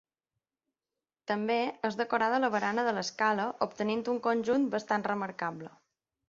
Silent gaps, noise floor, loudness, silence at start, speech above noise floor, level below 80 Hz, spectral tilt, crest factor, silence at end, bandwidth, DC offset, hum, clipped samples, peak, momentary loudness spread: none; under -90 dBFS; -31 LUFS; 1.3 s; over 60 dB; -76 dBFS; -5 dB/octave; 18 dB; 0.6 s; 7.6 kHz; under 0.1%; none; under 0.1%; -14 dBFS; 8 LU